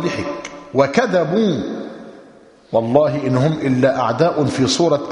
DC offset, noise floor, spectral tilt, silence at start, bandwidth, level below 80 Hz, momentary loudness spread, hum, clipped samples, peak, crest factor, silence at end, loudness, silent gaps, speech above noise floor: under 0.1%; -45 dBFS; -6 dB/octave; 0 s; 10.5 kHz; -52 dBFS; 12 LU; none; under 0.1%; 0 dBFS; 18 dB; 0 s; -17 LUFS; none; 29 dB